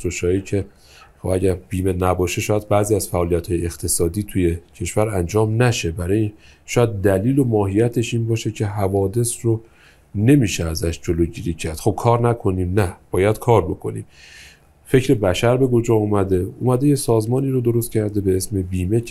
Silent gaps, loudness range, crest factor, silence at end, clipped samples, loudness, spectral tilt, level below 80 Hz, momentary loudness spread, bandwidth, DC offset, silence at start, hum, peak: none; 2 LU; 18 dB; 0 s; under 0.1%; -20 LUFS; -6 dB/octave; -42 dBFS; 7 LU; 15 kHz; under 0.1%; 0 s; none; 0 dBFS